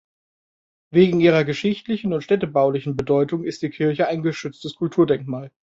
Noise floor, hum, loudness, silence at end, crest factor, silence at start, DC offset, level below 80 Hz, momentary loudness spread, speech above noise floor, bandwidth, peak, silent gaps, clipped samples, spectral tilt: under -90 dBFS; none; -21 LUFS; 0.3 s; 18 dB; 0.9 s; under 0.1%; -58 dBFS; 11 LU; over 70 dB; 7.8 kHz; -4 dBFS; none; under 0.1%; -7.5 dB/octave